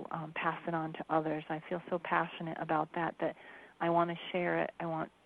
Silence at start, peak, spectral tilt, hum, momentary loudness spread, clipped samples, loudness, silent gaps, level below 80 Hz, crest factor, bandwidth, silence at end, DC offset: 0 s; -14 dBFS; -8 dB/octave; none; 7 LU; under 0.1%; -35 LUFS; none; -74 dBFS; 22 dB; 4.6 kHz; 0.2 s; under 0.1%